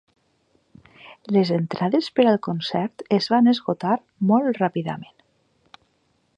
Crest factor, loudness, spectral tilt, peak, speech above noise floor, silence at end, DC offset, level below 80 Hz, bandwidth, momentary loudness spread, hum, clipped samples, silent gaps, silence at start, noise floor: 18 dB; -21 LUFS; -7.5 dB/octave; -4 dBFS; 46 dB; 1.35 s; under 0.1%; -68 dBFS; 8.6 kHz; 9 LU; none; under 0.1%; none; 1.05 s; -67 dBFS